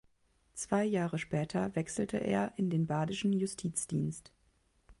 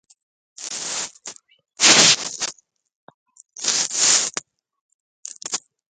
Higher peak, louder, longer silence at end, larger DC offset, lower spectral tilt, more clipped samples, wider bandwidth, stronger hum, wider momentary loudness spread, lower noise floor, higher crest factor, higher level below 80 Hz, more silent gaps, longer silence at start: second, -16 dBFS vs 0 dBFS; second, -34 LUFS vs -17 LUFS; second, 0.1 s vs 0.35 s; neither; first, -5.5 dB/octave vs 0.5 dB/octave; neither; second, 11.5 kHz vs 16 kHz; neither; second, 5 LU vs 24 LU; first, -72 dBFS vs -47 dBFS; second, 18 dB vs 24 dB; about the same, -64 dBFS vs -68 dBFS; second, none vs 2.96-3.08 s, 3.14-3.26 s, 4.81-5.23 s; about the same, 0.55 s vs 0.6 s